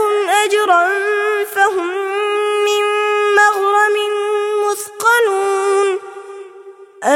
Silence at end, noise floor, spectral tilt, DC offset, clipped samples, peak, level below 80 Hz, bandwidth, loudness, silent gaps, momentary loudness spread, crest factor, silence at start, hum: 0 s; -38 dBFS; -0.5 dB/octave; under 0.1%; under 0.1%; 0 dBFS; -70 dBFS; 16.5 kHz; -15 LUFS; none; 8 LU; 14 dB; 0 s; none